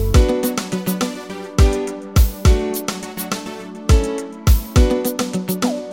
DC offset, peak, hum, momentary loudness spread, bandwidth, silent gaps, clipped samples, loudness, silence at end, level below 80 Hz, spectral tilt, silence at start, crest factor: under 0.1%; 0 dBFS; none; 10 LU; 17 kHz; none; under 0.1%; -19 LUFS; 0 s; -20 dBFS; -5.5 dB/octave; 0 s; 16 dB